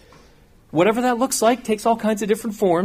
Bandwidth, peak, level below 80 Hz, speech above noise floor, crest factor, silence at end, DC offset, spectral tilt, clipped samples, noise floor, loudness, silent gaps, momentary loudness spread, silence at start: 15.5 kHz; -4 dBFS; -54 dBFS; 32 dB; 16 dB; 0 s; under 0.1%; -4.5 dB/octave; under 0.1%; -51 dBFS; -20 LUFS; none; 4 LU; 0.75 s